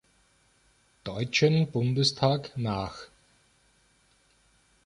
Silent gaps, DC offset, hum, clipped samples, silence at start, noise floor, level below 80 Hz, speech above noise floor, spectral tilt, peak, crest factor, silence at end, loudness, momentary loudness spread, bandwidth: none; under 0.1%; none; under 0.1%; 1.05 s; -65 dBFS; -58 dBFS; 39 dB; -5.5 dB/octave; -10 dBFS; 20 dB; 1.8 s; -27 LUFS; 15 LU; 11 kHz